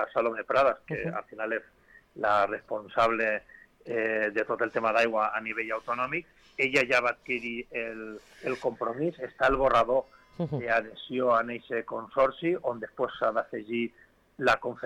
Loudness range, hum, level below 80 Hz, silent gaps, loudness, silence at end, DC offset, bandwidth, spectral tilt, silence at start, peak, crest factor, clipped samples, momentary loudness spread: 2 LU; none; -56 dBFS; none; -29 LUFS; 0 s; under 0.1%; 12 kHz; -5.5 dB/octave; 0 s; -14 dBFS; 14 dB; under 0.1%; 10 LU